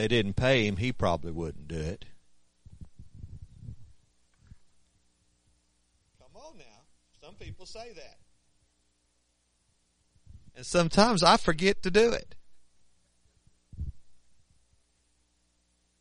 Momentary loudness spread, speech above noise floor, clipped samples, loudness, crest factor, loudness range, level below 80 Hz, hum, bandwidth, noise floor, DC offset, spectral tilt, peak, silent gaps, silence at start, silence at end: 26 LU; 46 dB; under 0.1%; -26 LUFS; 28 dB; 25 LU; -48 dBFS; 60 Hz at -70 dBFS; 10.5 kHz; -73 dBFS; under 0.1%; -5 dB/octave; -4 dBFS; none; 0 s; 1.85 s